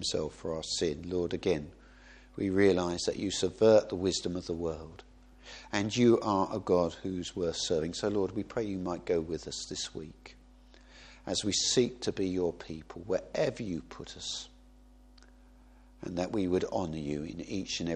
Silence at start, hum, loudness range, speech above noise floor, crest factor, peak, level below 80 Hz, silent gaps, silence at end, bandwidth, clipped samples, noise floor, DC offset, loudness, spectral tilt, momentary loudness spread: 0 s; none; 8 LU; 26 dB; 22 dB; -12 dBFS; -56 dBFS; none; 0 s; 10.5 kHz; under 0.1%; -57 dBFS; under 0.1%; -31 LUFS; -4.5 dB/octave; 15 LU